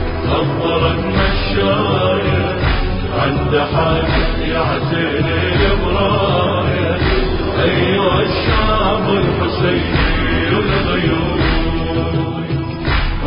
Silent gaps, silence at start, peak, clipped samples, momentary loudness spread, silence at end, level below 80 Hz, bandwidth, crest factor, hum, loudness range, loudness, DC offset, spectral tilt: none; 0 s; -2 dBFS; under 0.1%; 3 LU; 0 s; -22 dBFS; 5.4 kHz; 12 dB; none; 1 LU; -16 LUFS; under 0.1%; -11.5 dB/octave